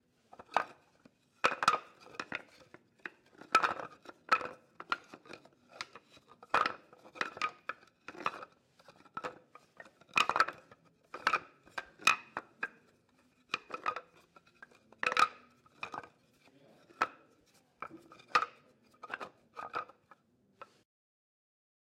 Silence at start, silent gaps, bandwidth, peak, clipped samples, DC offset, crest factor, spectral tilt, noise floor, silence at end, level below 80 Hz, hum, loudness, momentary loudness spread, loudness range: 0.5 s; none; 16 kHz; -12 dBFS; under 0.1%; under 0.1%; 28 dB; -1.5 dB/octave; -70 dBFS; 1.2 s; -82 dBFS; none; -35 LUFS; 23 LU; 6 LU